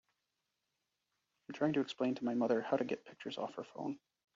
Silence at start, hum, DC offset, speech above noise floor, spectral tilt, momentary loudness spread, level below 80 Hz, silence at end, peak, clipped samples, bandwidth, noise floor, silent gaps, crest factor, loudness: 1.5 s; none; under 0.1%; 50 dB; -5 dB/octave; 11 LU; -82 dBFS; 0.4 s; -20 dBFS; under 0.1%; 7.4 kHz; -87 dBFS; none; 20 dB; -38 LUFS